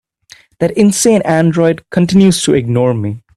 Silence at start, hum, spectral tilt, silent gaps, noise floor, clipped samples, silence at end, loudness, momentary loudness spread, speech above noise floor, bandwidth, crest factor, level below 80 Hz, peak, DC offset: 0.6 s; none; -5.5 dB/octave; none; -44 dBFS; under 0.1%; 0.2 s; -12 LUFS; 6 LU; 33 dB; 14 kHz; 12 dB; -46 dBFS; 0 dBFS; under 0.1%